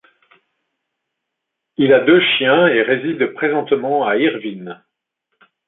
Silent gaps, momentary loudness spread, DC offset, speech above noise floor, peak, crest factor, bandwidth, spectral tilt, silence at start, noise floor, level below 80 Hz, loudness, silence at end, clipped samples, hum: none; 16 LU; under 0.1%; 63 dB; -2 dBFS; 16 dB; 4.1 kHz; -9.5 dB/octave; 1.8 s; -79 dBFS; -64 dBFS; -15 LUFS; 0.95 s; under 0.1%; none